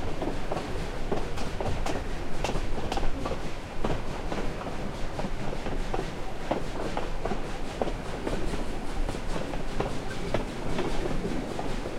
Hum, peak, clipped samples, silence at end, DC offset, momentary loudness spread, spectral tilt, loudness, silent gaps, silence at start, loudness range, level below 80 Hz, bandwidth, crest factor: none; -10 dBFS; under 0.1%; 0 s; under 0.1%; 3 LU; -5.5 dB/octave; -34 LUFS; none; 0 s; 1 LU; -34 dBFS; 11.5 kHz; 18 dB